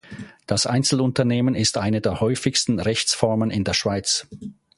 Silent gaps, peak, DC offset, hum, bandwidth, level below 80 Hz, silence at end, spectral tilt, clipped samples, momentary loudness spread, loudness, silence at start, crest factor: none; -2 dBFS; under 0.1%; none; 11.5 kHz; -46 dBFS; 0.25 s; -4 dB/octave; under 0.1%; 5 LU; -21 LUFS; 0.1 s; 20 dB